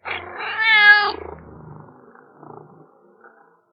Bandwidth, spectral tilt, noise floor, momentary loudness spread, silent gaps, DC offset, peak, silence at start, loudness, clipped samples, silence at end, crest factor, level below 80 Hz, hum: 5.4 kHz; -4 dB/octave; -52 dBFS; 22 LU; none; under 0.1%; 0 dBFS; 0.05 s; -14 LUFS; under 0.1%; 2 s; 22 dB; -56 dBFS; none